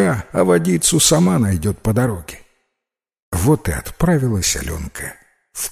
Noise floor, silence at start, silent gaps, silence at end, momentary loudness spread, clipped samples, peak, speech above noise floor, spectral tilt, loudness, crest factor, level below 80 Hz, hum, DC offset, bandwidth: -83 dBFS; 0 s; 3.22-3.32 s; 0 s; 17 LU; under 0.1%; 0 dBFS; 66 dB; -4.5 dB/octave; -17 LUFS; 18 dB; -34 dBFS; none; under 0.1%; 16 kHz